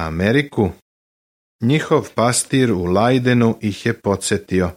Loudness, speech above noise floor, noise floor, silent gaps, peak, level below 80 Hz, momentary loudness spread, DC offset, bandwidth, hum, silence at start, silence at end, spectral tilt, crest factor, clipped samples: -18 LUFS; over 73 dB; under -90 dBFS; 0.82-1.59 s; -2 dBFS; -44 dBFS; 6 LU; under 0.1%; 16 kHz; none; 0 s; 0.05 s; -5.5 dB/octave; 16 dB; under 0.1%